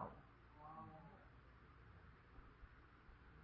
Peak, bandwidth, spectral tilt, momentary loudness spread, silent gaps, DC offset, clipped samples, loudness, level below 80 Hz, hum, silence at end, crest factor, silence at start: -36 dBFS; 5.4 kHz; -6 dB/octave; 8 LU; none; under 0.1%; under 0.1%; -63 LUFS; -68 dBFS; none; 0 s; 26 dB; 0 s